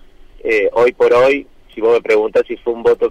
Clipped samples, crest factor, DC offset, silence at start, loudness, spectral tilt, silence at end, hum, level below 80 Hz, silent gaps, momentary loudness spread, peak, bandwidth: under 0.1%; 10 dB; under 0.1%; 0.45 s; -14 LUFS; -5 dB/octave; 0 s; none; -44 dBFS; none; 9 LU; -6 dBFS; 8.8 kHz